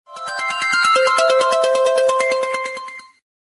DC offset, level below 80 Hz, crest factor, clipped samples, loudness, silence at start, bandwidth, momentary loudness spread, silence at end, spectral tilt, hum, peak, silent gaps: under 0.1%; -68 dBFS; 14 dB; under 0.1%; -16 LUFS; 0.1 s; 11.5 kHz; 13 LU; 0.55 s; 0 dB/octave; none; -4 dBFS; none